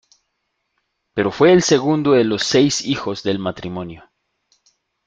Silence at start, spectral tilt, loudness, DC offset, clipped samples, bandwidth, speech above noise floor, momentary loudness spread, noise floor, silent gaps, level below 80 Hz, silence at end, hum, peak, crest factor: 1.15 s; -4.5 dB/octave; -17 LUFS; under 0.1%; under 0.1%; 9.4 kHz; 56 dB; 15 LU; -73 dBFS; none; -54 dBFS; 1.05 s; none; -2 dBFS; 18 dB